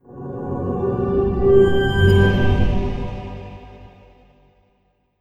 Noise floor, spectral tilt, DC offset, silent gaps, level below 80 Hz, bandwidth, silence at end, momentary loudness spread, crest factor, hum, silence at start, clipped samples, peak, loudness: -64 dBFS; -8 dB/octave; under 0.1%; none; -30 dBFS; 9 kHz; 0 s; 19 LU; 16 dB; none; 0 s; under 0.1%; -2 dBFS; -18 LUFS